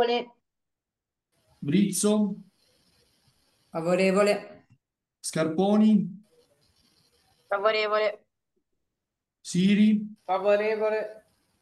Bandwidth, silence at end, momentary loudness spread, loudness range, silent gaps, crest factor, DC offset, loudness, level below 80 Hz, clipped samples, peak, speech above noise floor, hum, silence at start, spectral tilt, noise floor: 12.5 kHz; 0.45 s; 16 LU; 4 LU; none; 16 dB; under 0.1%; -25 LUFS; -74 dBFS; under 0.1%; -10 dBFS; 64 dB; none; 0 s; -5.5 dB/octave; -88 dBFS